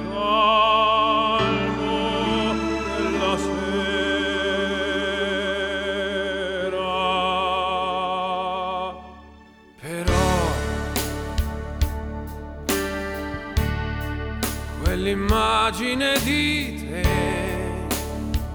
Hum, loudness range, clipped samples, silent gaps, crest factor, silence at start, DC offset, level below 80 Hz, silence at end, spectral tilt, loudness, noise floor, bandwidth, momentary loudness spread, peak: none; 5 LU; under 0.1%; none; 18 dB; 0 s; under 0.1%; -32 dBFS; 0 s; -4.5 dB/octave; -23 LUFS; -48 dBFS; over 20 kHz; 9 LU; -6 dBFS